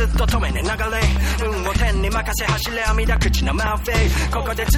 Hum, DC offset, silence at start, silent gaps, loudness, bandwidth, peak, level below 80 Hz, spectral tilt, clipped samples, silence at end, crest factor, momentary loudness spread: none; under 0.1%; 0 s; none; -20 LUFS; 17 kHz; -4 dBFS; -20 dBFS; -4.5 dB/octave; under 0.1%; 0 s; 14 dB; 3 LU